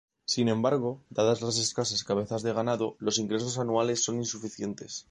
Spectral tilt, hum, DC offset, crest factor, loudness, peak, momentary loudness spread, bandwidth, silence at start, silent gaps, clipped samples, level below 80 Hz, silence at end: -4 dB/octave; none; under 0.1%; 18 dB; -29 LUFS; -12 dBFS; 8 LU; 11 kHz; 0.3 s; none; under 0.1%; -66 dBFS; 0.1 s